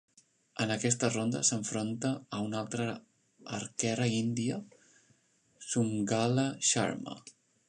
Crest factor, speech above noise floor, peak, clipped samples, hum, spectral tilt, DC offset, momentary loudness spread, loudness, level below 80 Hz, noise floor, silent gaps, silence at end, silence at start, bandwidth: 22 dB; 37 dB; -10 dBFS; under 0.1%; none; -4 dB/octave; under 0.1%; 13 LU; -32 LUFS; -72 dBFS; -69 dBFS; none; 0.4 s; 0.6 s; 11 kHz